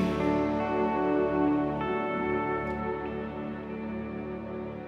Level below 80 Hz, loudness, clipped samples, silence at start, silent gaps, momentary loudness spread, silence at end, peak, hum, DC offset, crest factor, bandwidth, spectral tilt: -50 dBFS; -30 LUFS; under 0.1%; 0 s; none; 10 LU; 0 s; -14 dBFS; none; under 0.1%; 14 dB; 7 kHz; -8 dB/octave